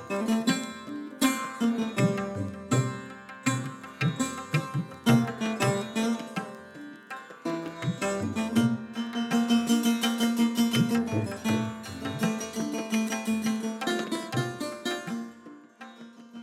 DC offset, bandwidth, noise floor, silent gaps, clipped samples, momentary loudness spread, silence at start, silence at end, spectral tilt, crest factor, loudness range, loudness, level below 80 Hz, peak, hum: under 0.1%; 16 kHz; -49 dBFS; none; under 0.1%; 15 LU; 0 s; 0 s; -5 dB/octave; 18 dB; 5 LU; -29 LUFS; -66 dBFS; -10 dBFS; none